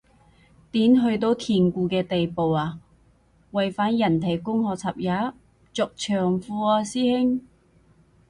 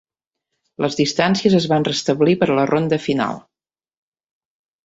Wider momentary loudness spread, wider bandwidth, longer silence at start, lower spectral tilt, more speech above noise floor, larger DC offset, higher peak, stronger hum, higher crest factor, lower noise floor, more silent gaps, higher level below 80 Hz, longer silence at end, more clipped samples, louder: about the same, 9 LU vs 8 LU; first, 11.5 kHz vs 8 kHz; about the same, 0.75 s vs 0.8 s; about the same, -6.5 dB/octave vs -5.5 dB/octave; second, 37 dB vs 72 dB; neither; second, -8 dBFS vs -2 dBFS; neither; about the same, 16 dB vs 18 dB; second, -59 dBFS vs -89 dBFS; neither; about the same, -56 dBFS vs -58 dBFS; second, 0.9 s vs 1.45 s; neither; second, -24 LUFS vs -18 LUFS